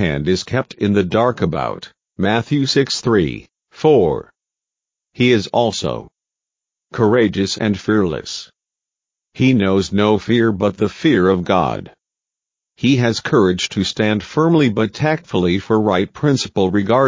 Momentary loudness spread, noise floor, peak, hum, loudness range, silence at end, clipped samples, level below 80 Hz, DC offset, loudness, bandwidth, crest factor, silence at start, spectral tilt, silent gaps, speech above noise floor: 8 LU; -86 dBFS; 0 dBFS; none; 3 LU; 0 s; under 0.1%; -42 dBFS; under 0.1%; -17 LUFS; 7.6 kHz; 16 dB; 0 s; -6 dB/octave; none; 70 dB